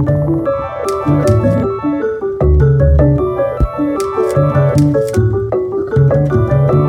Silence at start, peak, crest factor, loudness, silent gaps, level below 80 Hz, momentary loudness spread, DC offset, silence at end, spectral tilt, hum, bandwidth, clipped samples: 0 s; 0 dBFS; 12 dB; -13 LUFS; none; -22 dBFS; 6 LU; under 0.1%; 0 s; -9 dB/octave; none; 12 kHz; under 0.1%